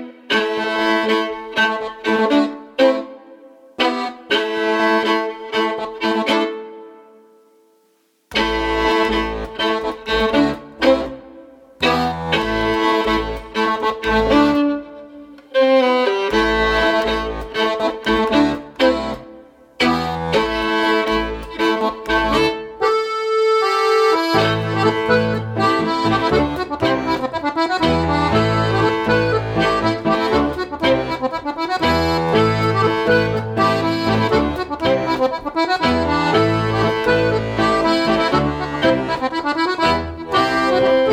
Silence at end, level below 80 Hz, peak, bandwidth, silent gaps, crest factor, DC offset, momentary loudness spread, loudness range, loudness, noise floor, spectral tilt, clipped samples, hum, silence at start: 0 s; -38 dBFS; -2 dBFS; 16 kHz; none; 16 dB; under 0.1%; 6 LU; 3 LU; -18 LUFS; -60 dBFS; -5.5 dB/octave; under 0.1%; none; 0 s